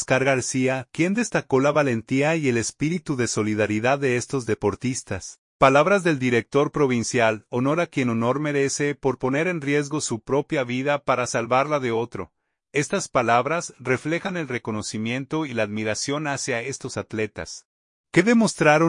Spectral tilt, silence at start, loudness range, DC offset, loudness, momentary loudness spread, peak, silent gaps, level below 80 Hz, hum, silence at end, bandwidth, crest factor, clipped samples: -5 dB/octave; 0 s; 5 LU; under 0.1%; -23 LUFS; 9 LU; -2 dBFS; 5.38-5.60 s, 17.65-18.04 s; -58 dBFS; none; 0 s; 11 kHz; 20 dB; under 0.1%